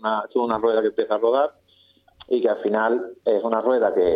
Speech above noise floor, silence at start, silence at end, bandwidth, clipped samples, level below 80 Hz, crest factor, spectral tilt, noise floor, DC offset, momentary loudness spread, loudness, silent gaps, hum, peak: 37 dB; 0.05 s; 0 s; 4.9 kHz; under 0.1%; -60 dBFS; 16 dB; -7.5 dB/octave; -58 dBFS; under 0.1%; 4 LU; -22 LUFS; none; none; -6 dBFS